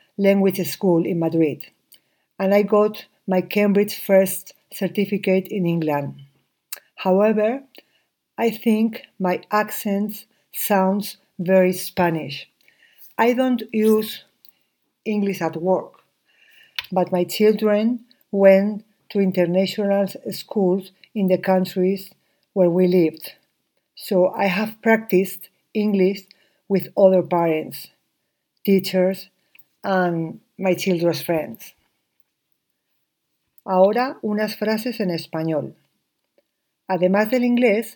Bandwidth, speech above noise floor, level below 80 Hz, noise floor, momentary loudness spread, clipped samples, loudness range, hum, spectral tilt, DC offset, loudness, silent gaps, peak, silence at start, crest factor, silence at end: 19 kHz; 55 dB; -72 dBFS; -75 dBFS; 15 LU; under 0.1%; 4 LU; none; -6.5 dB/octave; under 0.1%; -20 LUFS; none; 0 dBFS; 0.2 s; 22 dB; 0.05 s